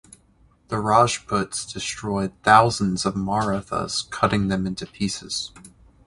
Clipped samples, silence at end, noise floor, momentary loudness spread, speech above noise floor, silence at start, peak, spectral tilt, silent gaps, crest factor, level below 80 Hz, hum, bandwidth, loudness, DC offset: under 0.1%; 0.4 s; -58 dBFS; 13 LU; 36 dB; 0.7 s; 0 dBFS; -4.5 dB/octave; none; 22 dB; -48 dBFS; none; 11.5 kHz; -22 LUFS; under 0.1%